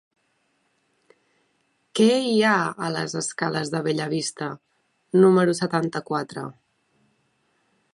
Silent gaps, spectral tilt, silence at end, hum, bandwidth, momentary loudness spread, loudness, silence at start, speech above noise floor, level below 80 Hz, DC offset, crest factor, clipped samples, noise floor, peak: none; -5 dB/octave; 1.4 s; none; 11.5 kHz; 16 LU; -23 LUFS; 1.95 s; 48 dB; -72 dBFS; under 0.1%; 20 dB; under 0.1%; -69 dBFS; -6 dBFS